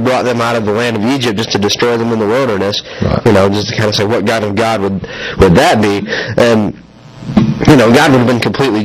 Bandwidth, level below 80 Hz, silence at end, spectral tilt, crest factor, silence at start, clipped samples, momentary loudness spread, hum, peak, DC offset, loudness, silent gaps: 15.5 kHz; -34 dBFS; 0 s; -5.5 dB/octave; 10 dB; 0 s; 0.6%; 8 LU; none; 0 dBFS; under 0.1%; -11 LUFS; none